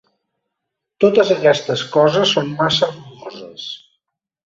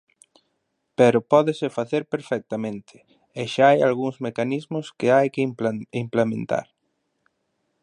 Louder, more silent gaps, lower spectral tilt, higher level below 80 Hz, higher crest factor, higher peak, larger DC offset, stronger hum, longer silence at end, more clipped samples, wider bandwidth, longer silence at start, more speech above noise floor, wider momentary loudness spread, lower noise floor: first, -15 LUFS vs -22 LUFS; neither; second, -4.5 dB/octave vs -6.5 dB/octave; first, -58 dBFS vs -68 dBFS; about the same, 18 dB vs 20 dB; about the same, 0 dBFS vs -2 dBFS; neither; neither; second, 0.75 s vs 1.2 s; neither; second, 7.8 kHz vs 11 kHz; about the same, 1 s vs 1 s; first, 64 dB vs 53 dB; first, 20 LU vs 13 LU; first, -79 dBFS vs -74 dBFS